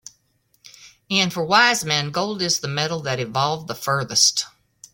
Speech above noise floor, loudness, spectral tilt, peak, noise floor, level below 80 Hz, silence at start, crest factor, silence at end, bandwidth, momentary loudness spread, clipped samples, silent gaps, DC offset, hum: 44 dB; -20 LUFS; -2.5 dB/octave; -2 dBFS; -65 dBFS; -60 dBFS; 0.8 s; 22 dB; 0.45 s; 17 kHz; 9 LU; under 0.1%; none; under 0.1%; none